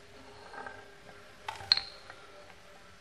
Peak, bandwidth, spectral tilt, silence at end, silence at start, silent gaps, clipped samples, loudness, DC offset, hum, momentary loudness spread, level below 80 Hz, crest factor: -6 dBFS; 14.5 kHz; -1.5 dB/octave; 0 s; 0 s; none; under 0.1%; -32 LUFS; 0.1%; none; 25 LU; -66 dBFS; 34 dB